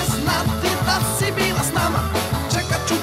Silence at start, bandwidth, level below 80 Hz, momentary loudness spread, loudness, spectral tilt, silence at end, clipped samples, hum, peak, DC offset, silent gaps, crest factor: 0 s; 16 kHz; -34 dBFS; 3 LU; -20 LUFS; -4 dB/octave; 0 s; under 0.1%; none; -8 dBFS; under 0.1%; none; 14 dB